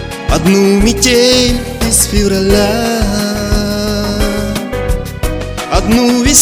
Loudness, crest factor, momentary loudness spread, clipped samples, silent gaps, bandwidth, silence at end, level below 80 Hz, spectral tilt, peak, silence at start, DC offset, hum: -12 LUFS; 12 dB; 9 LU; 0.5%; none; over 20 kHz; 0 s; -20 dBFS; -4 dB/octave; 0 dBFS; 0 s; under 0.1%; none